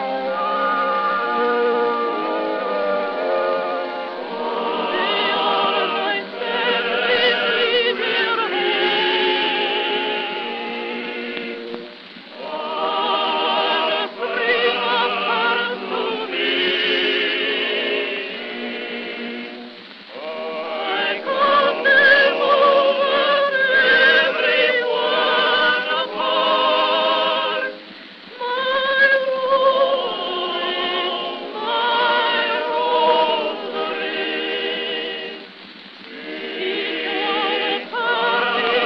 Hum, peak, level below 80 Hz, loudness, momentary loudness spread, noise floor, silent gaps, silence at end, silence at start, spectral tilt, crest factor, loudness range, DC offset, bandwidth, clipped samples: none; -2 dBFS; -72 dBFS; -19 LUFS; 13 LU; -40 dBFS; none; 0 s; 0 s; -4.5 dB/octave; 18 dB; 8 LU; under 0.1%; 6.2 kHz; under 0.1%